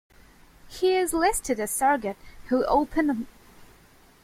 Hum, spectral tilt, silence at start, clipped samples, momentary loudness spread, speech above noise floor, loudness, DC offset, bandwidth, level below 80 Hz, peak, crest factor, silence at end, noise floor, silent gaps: none; -3 dB/octave; 0.65 s; under 0.1%; 13 LU; 31 dB; -25 LUFS; under 0.1%; 16.5 kHz; -48 dBFS; -10 dBFS; 16 dB; 0.6 s; -55 dBFS; none